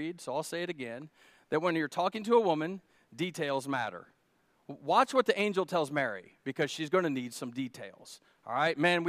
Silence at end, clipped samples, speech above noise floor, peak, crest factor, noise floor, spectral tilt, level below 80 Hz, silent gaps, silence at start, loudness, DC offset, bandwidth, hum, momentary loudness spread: 0 s; under 0.1%; 40 dB; -12 dBFS; 20 dB; -71 dBFS; -5 dB/octave; -82 dBFS; none; 0 s; -32 LUFS; under 0.1%; 15.5 kHz; none; 19 LU